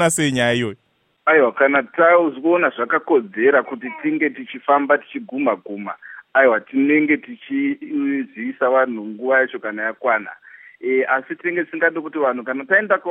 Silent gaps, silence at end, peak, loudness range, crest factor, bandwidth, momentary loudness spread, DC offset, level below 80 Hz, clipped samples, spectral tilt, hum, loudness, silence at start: none; 0 s; -2 dBFS; 4 LU; 18 dB; 15.5 kHz; 11 LU; under 0.1%; -66 dBFS; under 0.1%; -4.5 dB/octave; none; -19 LUFS; 0 s